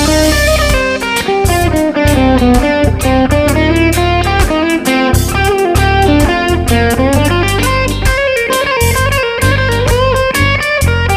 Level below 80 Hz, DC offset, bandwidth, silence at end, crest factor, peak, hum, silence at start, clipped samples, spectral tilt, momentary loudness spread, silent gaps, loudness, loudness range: -18 dBFS; under 0.1%; 16 kHz; 0 s; 10 dB; 0 dBFS; none; 0 s; under 0.1%; -5 dB/octave; 3 LU; none; -11 LUFS; 1 LU